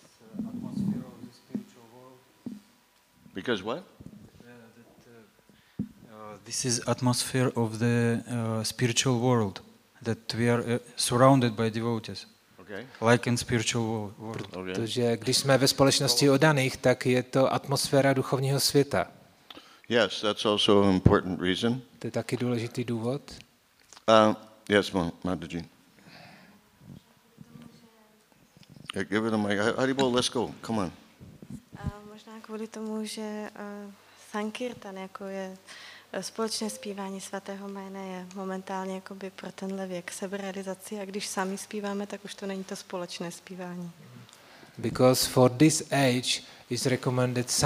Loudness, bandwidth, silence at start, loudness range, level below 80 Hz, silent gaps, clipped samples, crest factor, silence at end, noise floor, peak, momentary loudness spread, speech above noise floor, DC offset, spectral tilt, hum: -28 LUFS; 15.5 kHz; 0.3 s; 14 LU; -56 dBFS; none; under 0.1%; 28 dB; 0 s; -63 dBFS; -2 dBFS; 19 LU; 36 dB; under 0.1%; -4.5 dB/octave; none